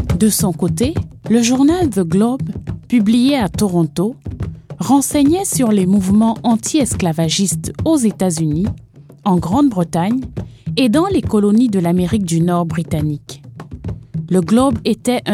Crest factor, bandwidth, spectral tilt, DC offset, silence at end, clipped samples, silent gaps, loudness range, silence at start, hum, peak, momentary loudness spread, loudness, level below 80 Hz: 14 dB; 16 kHz; -5.5 dB/octave; under 0.1%; 0 s; under 0.1%; none; 3 LU; 0 s; none; 0 dBFS; 14 LU; -15 LUFS; -38 dBFS